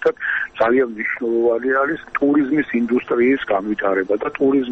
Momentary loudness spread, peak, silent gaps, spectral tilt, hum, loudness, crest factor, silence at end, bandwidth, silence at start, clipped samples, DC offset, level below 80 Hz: 5 LU; -4 dBFS; none; -7.5 dB/octave; none; -19 LUFS; 14 dB; 0 s; 6.2 kHz; 0 s; under 0.1%; under 0.1%; -54 dBFS